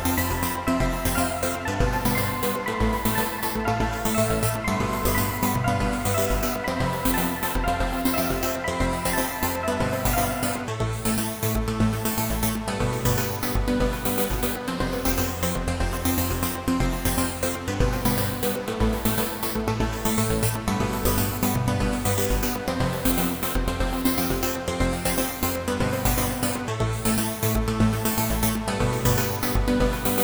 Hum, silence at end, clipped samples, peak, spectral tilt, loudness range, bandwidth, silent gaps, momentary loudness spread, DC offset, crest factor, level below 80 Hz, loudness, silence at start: none; 0 s; under 0.1%; -6 dBFS; -4.5 dB/octave; 1 LU; over 20 kHz; none; 3 LU; under 0.1%; 18 dB; -32 dBFS; -24 LUFS; 0 s